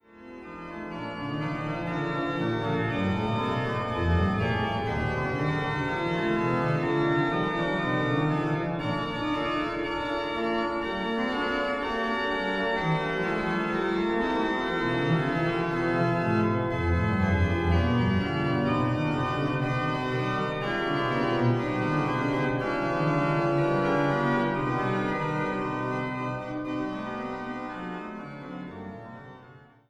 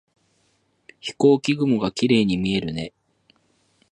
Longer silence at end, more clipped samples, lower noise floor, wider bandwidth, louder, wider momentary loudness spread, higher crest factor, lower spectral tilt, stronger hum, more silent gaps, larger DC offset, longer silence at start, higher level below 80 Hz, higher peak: second, 0.3 s vs 1.05 s; neither; second, -52 dBFS vs -66 dBFS; about the same, 11 kHz vs 10.5 kHz; second, -27 LUFS vs -21 LUFS; second, 9 LU vs 16 LU; about the same, 14 dB vs 18 dB; first, -7.5 dB/octave vs -6 dB/octave; neither; neither; neither; second, 0.15 s vs 1.05 s; first, -46 dBFS vs -54 dBFS; second, -12 dBFS vs -4 dBFS